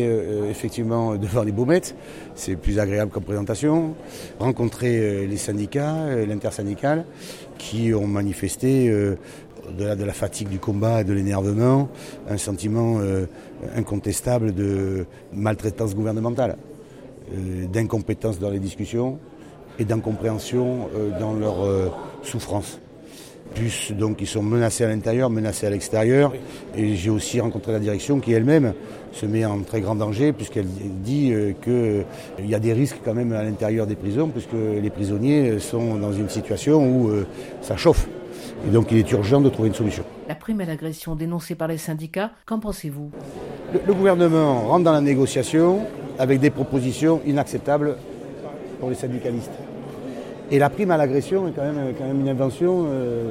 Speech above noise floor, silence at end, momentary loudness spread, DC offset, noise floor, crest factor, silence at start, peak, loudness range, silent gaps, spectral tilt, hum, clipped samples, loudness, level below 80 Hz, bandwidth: 21 dB; 0 s; 15 LU; under 0.1%; -42 dBFS; 18 dB; 0 s; -4 dBFS; 6 LU; none; -6.5 dB/octave; none; under 0.1%; -22 LUFS; -42 dBFS; 16 kHz